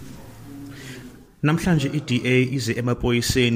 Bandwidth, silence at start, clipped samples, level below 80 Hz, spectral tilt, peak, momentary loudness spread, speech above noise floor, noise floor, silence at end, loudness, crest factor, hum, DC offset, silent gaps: 16 kHz; 0 s; under 0.1%; -42 dBFS; -5.5 dB/octave; -6 dBFS; 21 LU; 22 dB; -42 dBFS; 0 s; -21 LUFS; 16 dB; none; under 0.1%; none